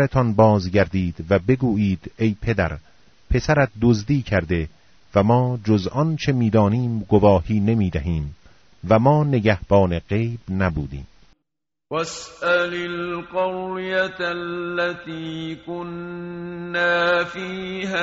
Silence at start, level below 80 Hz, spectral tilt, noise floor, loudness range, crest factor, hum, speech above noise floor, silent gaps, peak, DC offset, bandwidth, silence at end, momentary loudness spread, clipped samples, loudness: 0 s; -40 dBFS; -6 dB/octave; -82 dBFS; 6 LU; 18 dB; none; 62 dB; none; -2 dBFS; under 0.1%; 7.6 kHz; 0 s; 14 LU; under 0.1%; -21 LUFS